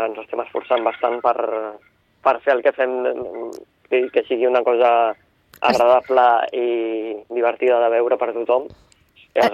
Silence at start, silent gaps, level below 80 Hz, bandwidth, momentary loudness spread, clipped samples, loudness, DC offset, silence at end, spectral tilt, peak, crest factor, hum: 0 s; none; -62 dBFS; 13.5 kHz; 12 LU; under 0.1%; -19 LUFS; under 0.1%; 0 s; -4.5 dB/octave; -4 dBFS; 16 dB; none